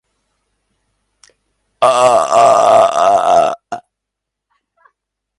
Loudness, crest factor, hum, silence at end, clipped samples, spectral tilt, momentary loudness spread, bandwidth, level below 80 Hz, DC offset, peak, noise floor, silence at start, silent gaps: -10 LUFS; 14 dB; none; 1.6 s; under 0.1%; -3 dB/octave; 16 LU; 11.5 kHz; -56 dBFS; under 0.1%; 0 dBFS; -79 dBFS; 1.8 s; none